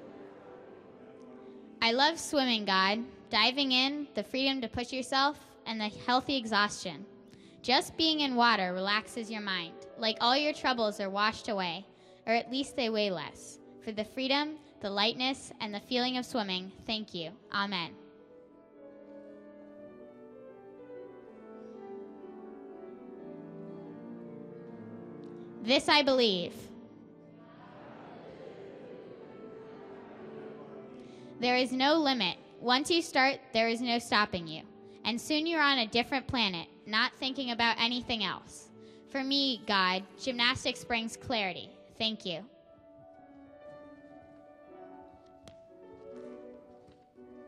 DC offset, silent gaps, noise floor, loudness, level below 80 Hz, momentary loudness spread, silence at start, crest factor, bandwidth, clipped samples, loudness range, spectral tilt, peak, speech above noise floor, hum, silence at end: under 0.1%; none; -57 dBFS; -30 LUFS; -68 dBFS; 24 LU; 0 s; 24 dB; 13.5 kHz; under 0.1%; 20 LU; -3.5 dB/octave; -10 dBFS; 26 dB; none; 0 s